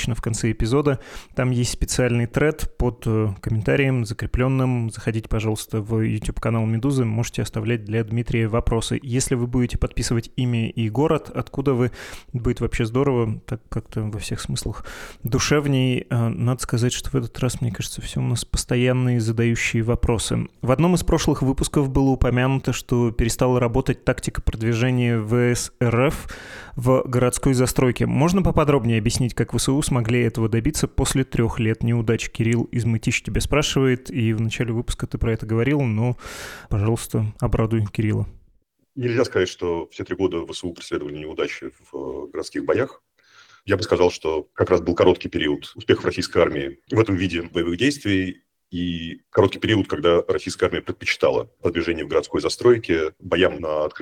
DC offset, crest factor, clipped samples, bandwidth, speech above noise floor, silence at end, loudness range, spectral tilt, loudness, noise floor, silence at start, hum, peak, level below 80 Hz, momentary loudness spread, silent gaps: under 0.1%; 18 dB; under 0.1%; 15.5 kHz; 40 dB; 0 s; 4 LU; -5.5 dB/octave; -22 LUFS; -62 dBFS; 0 s; none; -4 dBFS; -36 dBFS; 9 LU; none